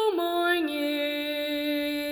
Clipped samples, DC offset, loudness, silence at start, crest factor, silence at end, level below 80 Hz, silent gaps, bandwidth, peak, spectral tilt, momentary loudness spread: under 0.1%; under 0.1%; -27 LUFS; 0 s; 12 dB; 0 s; -66 dBFS; none; over 20 kHz; -14 dBFS; -2.5 dB/octave; 4 LU